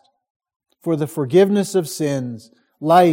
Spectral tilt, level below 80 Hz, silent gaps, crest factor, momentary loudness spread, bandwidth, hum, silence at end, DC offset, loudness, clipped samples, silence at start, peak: -6 dB/octave; -66 dBFS; none; 16 dB; 15 LU; 17 kHz; none; 0 s; under 0.1%; -18 LUFS; under 0.1%; 0.85 s; -2 dBFS